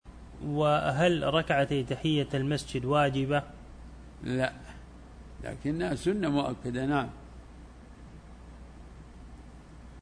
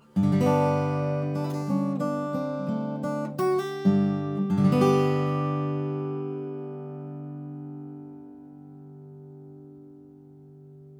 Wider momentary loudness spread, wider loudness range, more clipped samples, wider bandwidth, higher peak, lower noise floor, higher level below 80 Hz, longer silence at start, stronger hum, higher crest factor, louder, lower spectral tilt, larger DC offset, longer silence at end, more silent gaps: about the same, 24 LU vs 24 LU; second, 8 LU vs 17 LU; neither; second, 11 kHz vs 18.5 kHz; second, -14 dBFS vs -8 dBFS; about the same, -49 dBFS vs -49 dBFS; first, -50 dBFS vs -70 dBFS; about the same, 0.05 s vs 0.15 s; neither; about the same, 18 dB vs 18 dB; second, -29 LUFS vs -26 LUFS; second, -6.5 dB/octave vs -8.5 dB/octave; neither; about the same, 0 s vs 0 s; neither